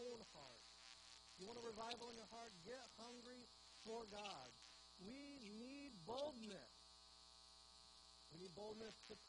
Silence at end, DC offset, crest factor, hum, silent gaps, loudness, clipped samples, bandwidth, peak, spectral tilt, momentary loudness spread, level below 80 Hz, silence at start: 0 s; under 0.1%; 22 dB; none; none; -57 LUFS; under 0.1%; 10 kHz; -36 dBFS; -3.5 dB/octave; 12 LU; -80 dBFS; 0 s